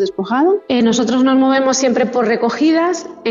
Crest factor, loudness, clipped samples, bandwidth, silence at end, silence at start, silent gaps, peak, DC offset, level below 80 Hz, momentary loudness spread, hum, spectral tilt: 12 dB; -14 LUFS; under 0.1%; 7.8 kHz; 0 s; 0 s; none; -2 dBFS; under 0.1%; -58 dBFS; 4 LU; none; -4 dB/octave